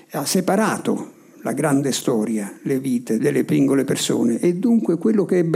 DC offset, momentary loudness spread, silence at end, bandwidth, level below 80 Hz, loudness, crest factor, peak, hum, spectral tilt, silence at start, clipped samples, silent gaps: under 0.1%; 7 LU; 0 s; 16 kHz; -70 dBFS; -20 LUFS; 12 dB; -6 dBFS; none; -5.5 dB/octave; 0.1 s; under 0.1%; none